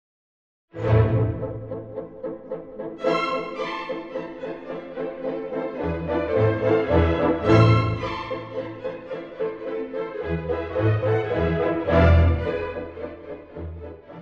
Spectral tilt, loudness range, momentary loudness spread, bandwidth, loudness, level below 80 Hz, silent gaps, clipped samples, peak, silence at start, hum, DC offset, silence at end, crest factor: -8.5 dB/octave; 8 LU; 17 LU; 7.2 kHz; -24 LUFS; -36 dBFS; none; under 0.1%; -4 dBFS; 0.75 s; none; under 0.1%; 0 s; 20 dB